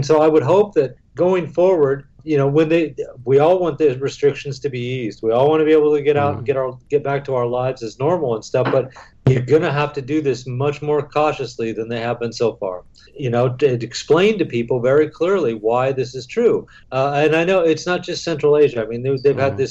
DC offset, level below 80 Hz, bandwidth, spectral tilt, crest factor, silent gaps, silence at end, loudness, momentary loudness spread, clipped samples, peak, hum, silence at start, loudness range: under 0.1%; -52 dBFS; 8 kHz; -6.5 dB/octave; 12 dB; none; 0 s; -18 LUFS; 9 LU; under 0.1%; -4 dBFS; none; 0 s; 3 LU